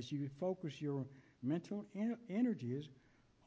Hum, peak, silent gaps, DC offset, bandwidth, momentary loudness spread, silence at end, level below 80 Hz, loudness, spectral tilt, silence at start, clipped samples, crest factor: none; -26 dBFS; none; under 0.1%; 8 kHz; 8 LU; 0.5 s; -80 dBFS; -42 LUFS; -8 dB/octave; 0 s; under 0.1%; 16 dB